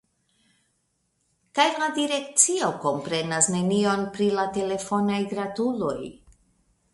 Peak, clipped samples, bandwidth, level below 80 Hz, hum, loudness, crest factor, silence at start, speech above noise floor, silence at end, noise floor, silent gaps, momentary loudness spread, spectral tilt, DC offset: -2 dBFS; under 0.1%; 11.5 kHz; -62 dBFS; none; -24 LUFS; 24 dB; 1.55 s; 48 dB; 0.75 s; -73 dBFS; none; 9 LU; -3 dB/octave; under 0.1%